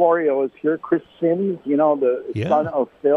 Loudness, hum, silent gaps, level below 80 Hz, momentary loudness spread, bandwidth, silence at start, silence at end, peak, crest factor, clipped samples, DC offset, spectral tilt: -20 LUFS; none; none; -64 dBFS; 6 LU; 6.4 kHz; 0 s; 0 s; -4 dBFS; 14 dB; under 0.1%; under 0.1%; -9 dB/octave